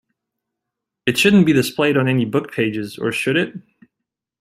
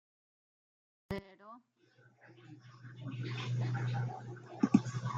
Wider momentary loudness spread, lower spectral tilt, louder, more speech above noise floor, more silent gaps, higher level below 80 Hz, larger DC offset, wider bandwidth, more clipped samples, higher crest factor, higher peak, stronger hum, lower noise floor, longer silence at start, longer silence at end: second, 10 LU vs 25 LU; second, -5.5 dB/octave vs -7 dB/octave; first, -18 LUFS vs -37 LUFS; first, 65 dB vs 30 dB; neither; first, -56 dBFS vs -68 dBFS; neither; first, 16 kHz vs 8 kHz; neither; second, 18 dB vs 26 dB; first, -2 dBFS vs -12 dBFS; neither; first, -82 dBFS vs -67 dBFS; about the same, 1.05 s vs 1.1 s; first, 0.8 s vs 0 s